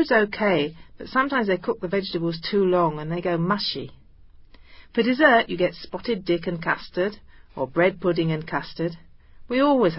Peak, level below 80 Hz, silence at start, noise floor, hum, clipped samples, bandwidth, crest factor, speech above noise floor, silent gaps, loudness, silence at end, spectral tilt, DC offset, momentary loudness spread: -2 dBFS; -54 dBFS; 0 s; -48 dBFS; none; under 0.1%; 5.8 kHz; 20 dB; 26 dB; none; -23 LUFS; 0 s; -10 dB/octave; under 0.1%; 11 LU